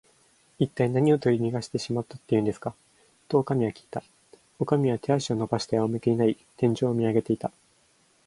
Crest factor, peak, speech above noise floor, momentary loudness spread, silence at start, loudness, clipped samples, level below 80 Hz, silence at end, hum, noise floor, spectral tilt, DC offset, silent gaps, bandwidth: 20 dB; -8 dBFS; 39 dB; 10 LU; 0.6 s; -26 LUFS; under 0.1%; -62 dBFS; 0.8 s; none; -64 dBFS; -7 dB/octave; under 0.1%; none; 11.5 kHz